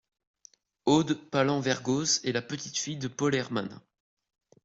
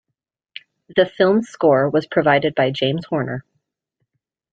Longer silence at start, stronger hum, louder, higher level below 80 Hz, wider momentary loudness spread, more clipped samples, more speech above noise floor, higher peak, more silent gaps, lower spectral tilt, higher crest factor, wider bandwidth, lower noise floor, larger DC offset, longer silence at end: about the same, 0.85 s vs 0.9 s; neither; second, -28 LUFS vs -18 LUFS; second, -68 dBFS vs -60 dBFS; second, 8 LU vs 22 LU; neither; second, 32 dB vs 62 dB; second, -10 dBFS vs -2 dBFS; neither; second, -4 dB/octave vs -7 dB/octave; about the same, 20 dB vs 18 dB; about the same, 8.2 kHz vs 7.8 kHz; second, -60 dBFS vs -80 dBFS; neither; second, 0.85 s vs 1.15 s